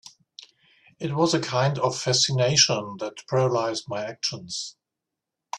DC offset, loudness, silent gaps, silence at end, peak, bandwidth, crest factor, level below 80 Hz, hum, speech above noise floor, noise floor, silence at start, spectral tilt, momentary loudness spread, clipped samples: under 0.1%; -23 LUFS; none; 0 s; -4 dBFS; 11.5 kHz; 22 dB; -64 dBFS; none; 61 dB; -86 dBFS; 0.05 s; -3.5 dB/octave; 14 LU; under 0.1%